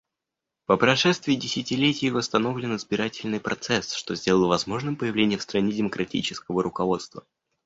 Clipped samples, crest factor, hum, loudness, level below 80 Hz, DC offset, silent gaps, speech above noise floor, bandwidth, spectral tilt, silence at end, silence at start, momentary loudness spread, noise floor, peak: under 0.1%; 22 dB; none; -25 LUFS; -58 dBFS; under 0.1%; none; 61 dB; 8 kHz; -4.5 dB/octave; 0.45 s; 0.7 s; 8 LU; -86 dBFS; -4 dBFS